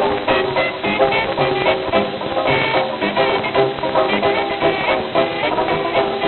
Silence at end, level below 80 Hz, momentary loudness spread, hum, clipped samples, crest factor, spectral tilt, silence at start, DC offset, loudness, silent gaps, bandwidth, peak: 0 s; -46 dBFS; 3 LU; none; under 0.1%; 16 dB; -8 dB/octave; 0 s; under 0.1%; -17 LUFS; none; 4.4 kHz; -2 dBFS